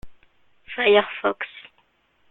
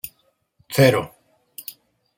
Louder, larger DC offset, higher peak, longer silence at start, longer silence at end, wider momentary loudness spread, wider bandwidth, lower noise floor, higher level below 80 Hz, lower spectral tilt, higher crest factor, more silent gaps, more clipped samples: about the same, -21 LUFS vs -19 LUFS; neither; about the same, -4 dBFS vs -2 dBFS; about the same, 0.05 s vs 0.05 s; first, 0.7 s vs 0.45 s; second, 18 LU vs 22 LU; second, 4.1 kHz vs 17 kHz; about the same, -64 dBFS vs -65 dBFS; about the same, -58 dBFS vs -60 dBFS; about the same, -6.5 dB/octave vs -5.5 dB/octave; about the same, 22 dB vs 22 dB; neither; neither